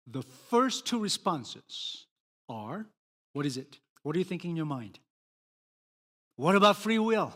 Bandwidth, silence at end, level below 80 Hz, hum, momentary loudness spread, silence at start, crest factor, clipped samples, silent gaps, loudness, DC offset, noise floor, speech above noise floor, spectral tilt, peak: 16 kHz; 0 s; -80 dBFS; none; 19 LU; 0.05 s; 24 dB; under 0.1%; 2.11-2.46 s, 2.97-3.34 s, 3.90-3.96 s, 5.10-6.31 s; -30 LUFS; under 0.1%; under -90 dBFS; over 60 dB; -4.5 dB/octave; -8 dBFS